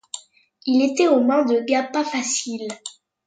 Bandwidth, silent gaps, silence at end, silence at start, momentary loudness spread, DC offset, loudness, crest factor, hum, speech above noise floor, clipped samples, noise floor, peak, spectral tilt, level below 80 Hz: 9.6 kHz; none; 0.35 s; 0.15 s; 18 LU; under 0.1%; -20 LUFS; 18 dB; none; 30 dB; under 0.1%; -50 dBFS; -4 dBFS; -2.5 dB/octave; -76 dBFS